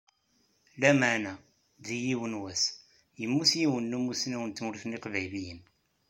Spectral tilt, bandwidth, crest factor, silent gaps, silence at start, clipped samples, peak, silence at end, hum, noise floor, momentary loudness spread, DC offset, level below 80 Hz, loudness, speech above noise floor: -3.5 dB/octave; 16.5 kHz; 24 dB; none; 0.75 s; under 0.1%; -8 dBFS; 0.5 s; none; -71 dBFS; 16 LU; under 0.1%; -70 dBFS; -30 LUFS; 41 dB